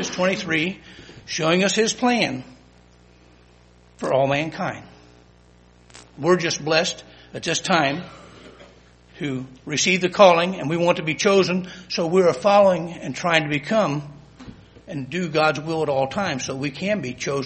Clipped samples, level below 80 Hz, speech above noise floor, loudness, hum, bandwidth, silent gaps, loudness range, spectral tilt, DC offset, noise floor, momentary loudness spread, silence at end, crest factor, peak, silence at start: under 0.1%; -56 dBFS; 31 dB; -21 LUFS; 60 Hz at -50 dBFS; 8.8 kHz; none; 7 LU; -4 dB/octave; under 0.1%; -52 dBFS; 15 LU; 0 s; 22 dB; 0 dBFS; 0 s